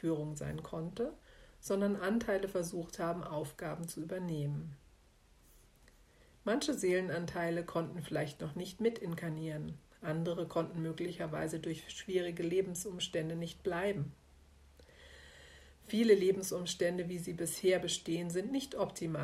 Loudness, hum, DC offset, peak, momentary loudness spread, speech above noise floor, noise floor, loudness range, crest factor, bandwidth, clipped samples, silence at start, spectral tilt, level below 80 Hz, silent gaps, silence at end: -37 LUFS; none; under 0.1%; -16 dBFS; 10 LU; 29 dB; -65 dBFS; 7 LU; 22 dB; 15.5 kHz; under 0.1%; 0 s; -5 dB/octave; -64 dBFS; none; 0 s